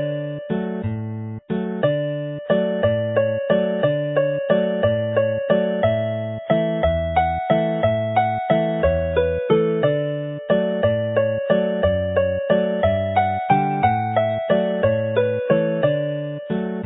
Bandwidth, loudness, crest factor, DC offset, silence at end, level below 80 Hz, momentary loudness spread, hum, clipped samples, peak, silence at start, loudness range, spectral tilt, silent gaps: 4 kHz; -21 LUFS; 16 dB; under 0.1%; 0 s; -40 dBFS; 7 LU; none; under 0.1%; -4 dBFS; 0 s; 1 LU; -12 dB/octave; none